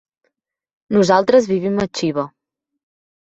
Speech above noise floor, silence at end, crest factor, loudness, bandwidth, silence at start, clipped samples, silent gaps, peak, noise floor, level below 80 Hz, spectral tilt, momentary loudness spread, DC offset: 55 dB; 1.05 s; 18 dB; -17 LUFS; 8 kHz; 0.9 s; under 0.1%; none; -2 dBFS; -71 dBFS; -56 dBFS; -5.5 dB/octave; 10 LU; under 0.1%